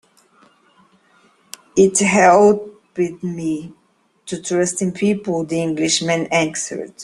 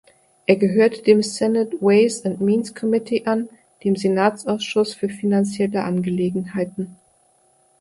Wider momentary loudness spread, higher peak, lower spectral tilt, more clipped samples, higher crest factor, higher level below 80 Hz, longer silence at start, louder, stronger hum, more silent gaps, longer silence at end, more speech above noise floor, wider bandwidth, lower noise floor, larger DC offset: first, 16 LU vs 10 LU; about the same, 0 dBFS vs -2 dBFS; second, -4 dB/octave vs -6 dB/octave; neither; about the same, 18 dB vs 18 dB; about the same, -58 dBFS vs -62 dBFS; first, 1.75 s vs 0.5 s; first, -17 LUFS vs -20 LUFS; neither; neither; second, 0 s vs 0.85 s; about the same, 39 dB vs 40 dB; first, 13 kHz vs 11.5 kHz; second, -55 dBFS vs -59 dBFS; neither